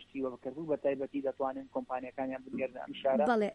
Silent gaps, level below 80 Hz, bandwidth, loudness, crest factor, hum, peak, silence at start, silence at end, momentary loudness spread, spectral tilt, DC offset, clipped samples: none; -70 dBFS; 10.5 kHz; -35 LUFS; 18 dB; none; -18 dBFS; 0 s; 0 s; 10 LU; -7 dB/octave; under 0.1%; under 0.1%